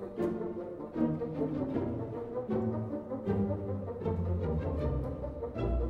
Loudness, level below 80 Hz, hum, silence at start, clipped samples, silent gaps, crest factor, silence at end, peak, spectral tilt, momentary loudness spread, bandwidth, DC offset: -35 LUFS; -42 dBFS; none; 0 s; under 0.1%; none; 16 dB; 0 s; -18 dBFS; -10.5 dB/octave; 6 LU; 5.8 kHz; under 0.1%